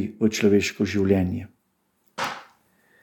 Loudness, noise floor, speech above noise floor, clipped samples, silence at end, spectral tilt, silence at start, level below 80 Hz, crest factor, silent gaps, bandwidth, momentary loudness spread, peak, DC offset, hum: -23 LUFS; -70 dBFS; 48 dB; under 0.1%; 0.6 s; -5.5 dB/octave; 0 s; -58 dBFS; 18 dB; none; 17.5 kHz; 20 LU; -6 dBFS; under 0.1%; none